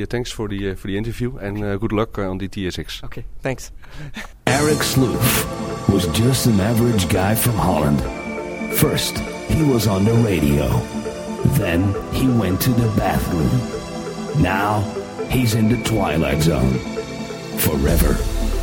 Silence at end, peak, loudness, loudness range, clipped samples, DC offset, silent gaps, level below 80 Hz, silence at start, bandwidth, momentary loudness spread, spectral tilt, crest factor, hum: 0 s; -2 dBFS; -19 LUFS; 7 LU; under 0.1%; under 0.1%; none; -30 dBFS; 0 s; 17 kHz; 11 LU; -5.5 dB/octave; 18 dB; none